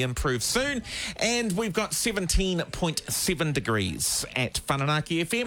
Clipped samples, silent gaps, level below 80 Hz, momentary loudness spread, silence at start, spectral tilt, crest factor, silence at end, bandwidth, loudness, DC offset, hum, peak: under 0.1%; none; -40 dBFS; 3 LU; 0 s; -3.5 dB/octave; 16 dB; 0 s; 19 kHz; -26 LUFS; under 0.1%; none; -10 dBFS